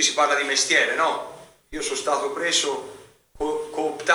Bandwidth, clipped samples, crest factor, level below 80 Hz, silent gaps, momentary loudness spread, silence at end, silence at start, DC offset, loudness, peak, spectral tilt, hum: over 20 kHz; under 0.1%; 20 dB; -56 dBFS; none; 14 LU; 0 s; 0 s; under 0.1%; -22 LUFS; -4 dBFS; 0 dB/octave; none